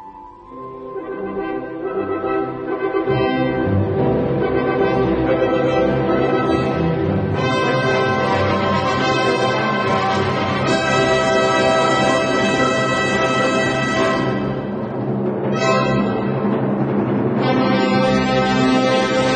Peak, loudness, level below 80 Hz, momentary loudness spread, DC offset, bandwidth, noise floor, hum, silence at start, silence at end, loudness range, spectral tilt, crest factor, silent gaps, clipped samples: -4 dBFS; -18 LUFS; -42 dBFS; 8 LU; under 0.1%; 9 kHz; -38 dBFS; none; 0 s; 0 s; 4 LU; -6 dB/octave; 14 dB; none; under 0.1%